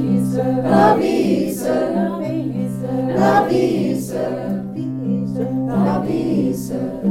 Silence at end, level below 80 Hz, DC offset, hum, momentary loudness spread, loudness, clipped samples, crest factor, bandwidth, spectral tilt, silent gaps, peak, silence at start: 0 s; -50 dBFS; under 0.1%; none; 9 LU; -19 LUFS; under 0.1%; 18 dB; 16 kHz; -7 dB/octave; none; 0 dBFS; 0 s